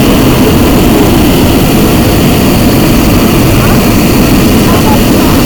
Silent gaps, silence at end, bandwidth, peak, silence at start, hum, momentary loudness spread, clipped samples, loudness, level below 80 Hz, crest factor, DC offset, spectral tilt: none; 0 s; over 20 kHz; 0 dBFS; 0 s; none; 1 LU; 0.8%; -6 LUFS; -16 dBFS; 4 dB; under 0.1%; -5.5 dB/octave